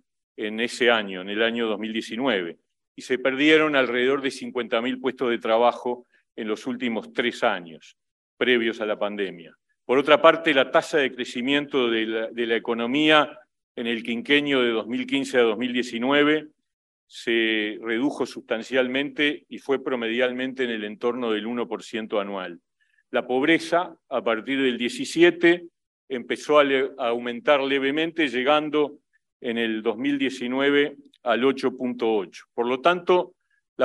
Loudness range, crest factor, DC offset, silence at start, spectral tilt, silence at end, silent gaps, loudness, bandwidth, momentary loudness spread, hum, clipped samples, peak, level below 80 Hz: 5 LU; 22 dB; under 0.1%; 0.4 s; -4.5 dB/octave; 0 s; 2.88-2.95 s, 8.11-8.37 s, 13.63-13.75 s, 16.73-17.07 s, 25.87-26.08 s, 29.32-29.40 s, 33.69-33.76 s; -23 LUFS; 12 kHz; 11 LU; none; under 0.1%; -2 dBFS; -76 dBFS